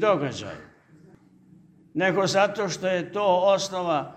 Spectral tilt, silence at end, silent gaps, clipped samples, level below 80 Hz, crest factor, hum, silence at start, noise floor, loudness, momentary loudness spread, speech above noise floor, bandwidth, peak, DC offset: -4.5 dB/octave; 0 s; none; under 0.1%; -66 dBFS; 18 dB; none; 0 s; -54 dBFS; -24 LUFS; 14 LU; 31 dB; 13 kHz; -8 dBFS; under 0.1%